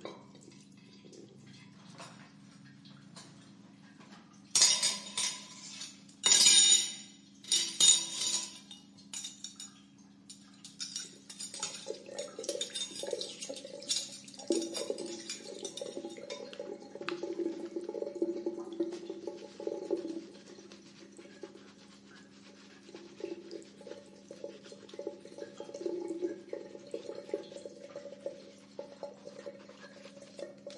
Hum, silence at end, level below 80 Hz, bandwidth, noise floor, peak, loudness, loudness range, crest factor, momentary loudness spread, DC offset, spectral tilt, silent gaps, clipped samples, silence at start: none; 0 s; -86 dBFS; 11.5 kHz; -58 dBFS; -10 dBFS; -31 LUFS; 24 LU; 28 dB; 27 LU; under 0.1%; 0 dB/octave; none; under 0.1%; 0 s